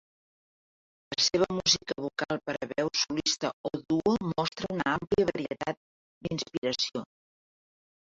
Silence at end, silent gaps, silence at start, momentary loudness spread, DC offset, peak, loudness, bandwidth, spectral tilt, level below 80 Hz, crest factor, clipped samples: 1.15 s; 3.53-3.64 s, 5.77-6.21 s, 6.58-6.62 s; 1.1 s; 10 LU; under 0.1%; -10 dBFS; -29 LUFS; 7.8 kHz; -3.5 dB/octave; -60 dBFS; 22 dB; under 0.1%